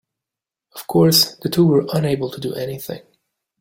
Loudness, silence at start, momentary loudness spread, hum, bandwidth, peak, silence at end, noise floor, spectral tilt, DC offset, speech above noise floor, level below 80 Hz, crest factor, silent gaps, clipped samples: -17 LUFS; 0.75 s; 20 LU; none; 17 kHz; -2 dBFS; 0.6 s; -87 dBFS; -5 dB/octave; under 0.1%; 69 dB; -56 dBFS; 18 dB; none; under 0.1%